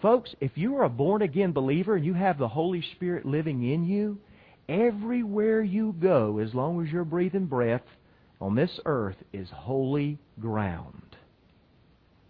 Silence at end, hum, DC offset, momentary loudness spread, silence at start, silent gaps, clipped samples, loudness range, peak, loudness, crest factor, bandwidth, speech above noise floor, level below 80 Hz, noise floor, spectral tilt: 1.15 s; none; under 0.1%; 9 LU; 0 s; none; under 0.1%; 4 LU; -10 dBFS; -27 LUFS; 18 dB; 5 kHz; 34 dB; -60 dBFS; -61 dBFS; -11 dB/octave